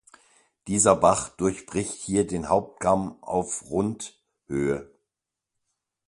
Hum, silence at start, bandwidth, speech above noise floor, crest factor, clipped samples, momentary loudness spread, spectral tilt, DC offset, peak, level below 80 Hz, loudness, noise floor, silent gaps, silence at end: none; 0.65 s; 11.5 kHz; 62 dB; 24 dB; under 0.1%; 12 LU; -5 dB/octave; under 0.1%; -4 dBFS; -52 dBFS; -25 LUFS; -87 dBFS; none; 1.25 s